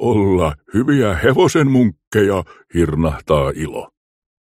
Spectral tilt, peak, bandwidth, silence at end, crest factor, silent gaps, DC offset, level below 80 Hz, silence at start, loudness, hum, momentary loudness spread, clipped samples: -6.5 dB/octave; -2 dBFS; 15.5 kHz; 0.65 s; 14 dB; 2.07-2.11 s; under 0.1%; -34 dBFS; 0 s; -16 LUFS; none; 10 LU; under 0.1%